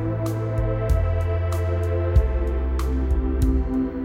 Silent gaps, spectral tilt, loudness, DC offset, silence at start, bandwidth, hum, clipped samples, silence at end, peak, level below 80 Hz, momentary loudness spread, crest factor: none; -8.5 dB/octave; -24 LUFS; under 0.1%; 0 s; 15 kHz; none; under 0.1%; 0 s; -6 dBFS; -24 dBFS; 4 LU; 14 dB